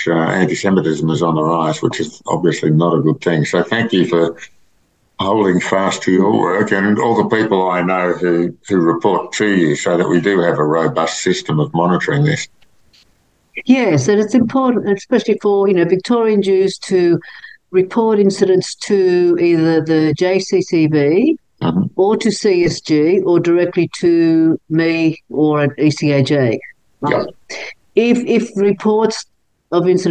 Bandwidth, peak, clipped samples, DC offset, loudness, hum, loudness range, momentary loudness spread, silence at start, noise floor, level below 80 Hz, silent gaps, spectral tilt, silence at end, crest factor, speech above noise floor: 9.4 kHz; 0 dBFS; under 0.1%; 0.2%; -15 LUFS; none; 2 LU; 5 LU; 0 s; -59 dBFS; -54 dBFS; none; -6 dB/octave; 0 s; 14 dB; 45 dB